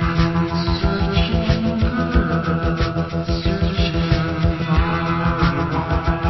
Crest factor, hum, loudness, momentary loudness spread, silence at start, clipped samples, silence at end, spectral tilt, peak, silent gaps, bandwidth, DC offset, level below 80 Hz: 16 dB; none; -20 LUFS; 3 LU; 0 s; under 0.1%; 0 s; -7.5 dB/octave; -2 dBFS; none; 6 kHz; under 0.1%; -24 dBFS